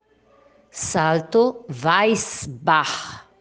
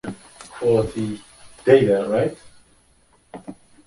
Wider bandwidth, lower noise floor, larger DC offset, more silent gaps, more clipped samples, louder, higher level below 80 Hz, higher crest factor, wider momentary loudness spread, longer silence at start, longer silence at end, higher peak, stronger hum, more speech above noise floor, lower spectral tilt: second, 10 kHz vs 11.5 kHz; about the same, -56 dBFS vs -58 dBFS; neither; neither; neither; about the same, -21 LUFS vs -20 LUFS; second, -58 dBFS vs -50 dBFS; about the same, 20 dB vs 20 dB; second, 12 LU vs 24 LU; first, 0.75 s vs 0.05 s; second, 0.2 s vs 0.35 s; about the same, -2 dBFS vs -2 dBFS; neither; second, 36 dB vs 40 dB; second, -4 dB/octave vs -7 dB/octave